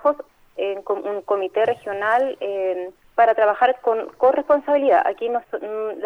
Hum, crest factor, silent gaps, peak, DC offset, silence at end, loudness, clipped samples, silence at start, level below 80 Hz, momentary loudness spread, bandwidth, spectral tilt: none; 16 dB; none; -4 dBFS; under 0.1%; 0 s; -21 LUFS; under 0.1%; 0 s; -62 dBFS; 10 LU; 9.4 kHz; -5.5 dB/octave